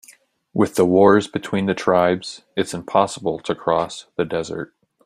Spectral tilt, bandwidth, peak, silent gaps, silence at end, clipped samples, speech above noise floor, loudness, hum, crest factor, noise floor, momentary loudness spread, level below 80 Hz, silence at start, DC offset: -5.5 dB/octave; 15.5 kHz; -2 dBFS; none; 0.4 s; under 0.1%; 33 dB; -20 LUFS; none; 18 dB; -52 dBFS; 14 LU; -58 dBFS; 0.55 s; under 0.1%